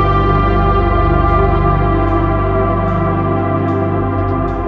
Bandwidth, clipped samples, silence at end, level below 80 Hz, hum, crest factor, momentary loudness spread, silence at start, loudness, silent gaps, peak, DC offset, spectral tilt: 5 kHz; under 0.1%; 0 s; -20 dBFS; 50 Hz at -35 dBFS; 12 dB; 3 LU; 0 s; -14 LUFS; none; 0 dBFS; under 0.1%; -10 dB/octave